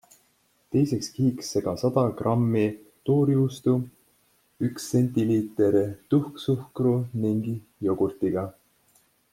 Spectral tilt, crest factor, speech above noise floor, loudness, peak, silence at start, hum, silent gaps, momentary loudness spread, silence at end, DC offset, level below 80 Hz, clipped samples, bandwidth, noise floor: -7.5 dB/octave; 18 dB; 42 dB; -25 LUFS; -8 dBFS; 0.7 s; none; none; 7 LU; 0.8 s; under 0.1%; -62 dBFS; under 0.1%; 16 kHz; -66 dBFS